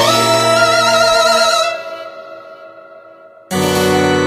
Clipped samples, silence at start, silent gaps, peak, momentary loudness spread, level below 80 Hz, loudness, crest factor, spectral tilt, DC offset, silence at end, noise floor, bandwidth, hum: under 0.1%; 0 s; none; 0 dBFS; 20 LU; -48 dBFS; -12 LUFS; 14 dB; -3 dB/octave; under 0.1%; 0 s; -40 dBFS; 15.5 kHz; none